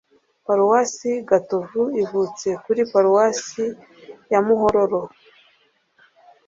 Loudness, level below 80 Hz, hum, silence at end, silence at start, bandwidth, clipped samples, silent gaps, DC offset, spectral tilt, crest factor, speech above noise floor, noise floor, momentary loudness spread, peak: -20 LUFS; -60 dBFS; none; 1.4 s; 0.5 s; 7.8 kHz; under 0.1%; none; under 0.1%; -5 dB/octave; 18 dB; 42 dB; -62 dBFS; 11 LU; -4 dBFS